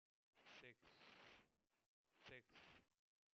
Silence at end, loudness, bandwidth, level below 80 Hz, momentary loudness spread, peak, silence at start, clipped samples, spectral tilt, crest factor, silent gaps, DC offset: 0.45 s; -66 LUFS; 7.2 kHz; under -90 dBFS; 5 LU; -48 dBFS; 0.35 s; under 0.1%; -1.5 dB/octave; 22 dB; 1.86-2.04 s; under 0.1%